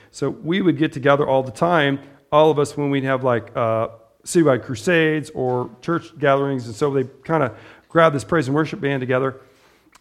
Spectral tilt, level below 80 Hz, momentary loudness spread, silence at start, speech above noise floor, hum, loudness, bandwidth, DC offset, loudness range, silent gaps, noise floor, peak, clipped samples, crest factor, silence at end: -6 dB/octave; -58 dBFS; 8 LU; 0.15 s; 34 dB; none; -20 LUFS; 14 kHz; under 0.1%; 2 LU; none; -54 dBFS; 0 dBFS; under 0.1%; 18 dB; 0.6 s